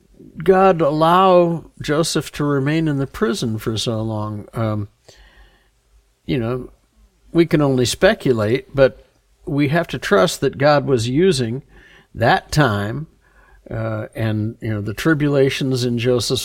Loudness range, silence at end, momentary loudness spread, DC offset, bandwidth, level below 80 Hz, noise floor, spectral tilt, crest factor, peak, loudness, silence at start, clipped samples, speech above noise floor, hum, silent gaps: 7 LU; 0 s; 11 LU; under 0.1%; 17 kHz; -44 dBFS; -57 dBFS; -5.5 dB/octave; 16 dB; -2 dBFS; -18 LUFS; 0.2 s; under 0.1%; 39 dB; none; none